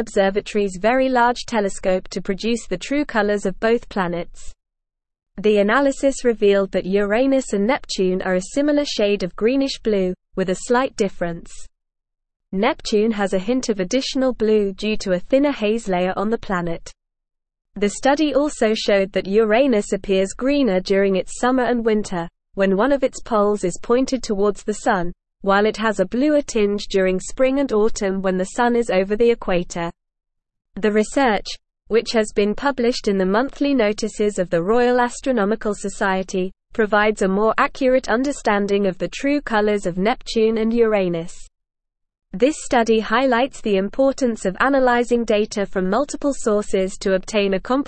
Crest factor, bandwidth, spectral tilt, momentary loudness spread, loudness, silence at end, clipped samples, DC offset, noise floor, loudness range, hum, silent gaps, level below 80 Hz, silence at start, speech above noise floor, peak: 18 dB; 8.8 kHz; -5 dB/octave; 6 LU; -20 LUFS; 0 s; under 0.1%; 0.4%; -81 dBFS; 3 LU; none; none; -42 dBFS; 0 s; 62 dB; -2 dBFS